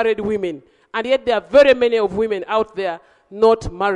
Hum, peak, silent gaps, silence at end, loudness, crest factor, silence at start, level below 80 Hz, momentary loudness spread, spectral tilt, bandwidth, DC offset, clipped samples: none; -2 dBFS; none; 0 s; -18 LUFS; 16 dB; 0 s; -44 dBFS; 14 LU; -5.5 dB/octave; 10.5 kHz; under 0.1%; under 0.1%